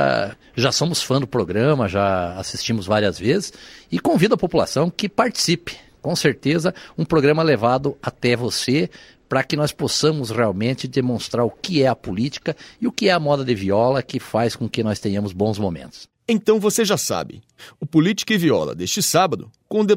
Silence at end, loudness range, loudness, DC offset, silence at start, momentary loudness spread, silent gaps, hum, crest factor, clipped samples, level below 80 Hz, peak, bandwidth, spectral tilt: 0 s; 2 LU; -20 LUFS; under 0.1%; 0 s; 9 LU; none; none; 18 dB; under 0.1%; -52 dBFS; -2 dBFS; 16 kHz; -5 dB/octave